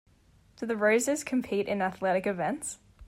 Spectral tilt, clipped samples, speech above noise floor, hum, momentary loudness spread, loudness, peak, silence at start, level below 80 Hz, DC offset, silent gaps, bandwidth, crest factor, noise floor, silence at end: -4.5 dB/octave; under 0.1%; 33 dB; none; 11 LU; -29 LUFS; -14 dBFS; 0.6 s; -64 dBFS; under 0.1%; none; 16 kHz; 16 dB; -61 dBFS; 0 s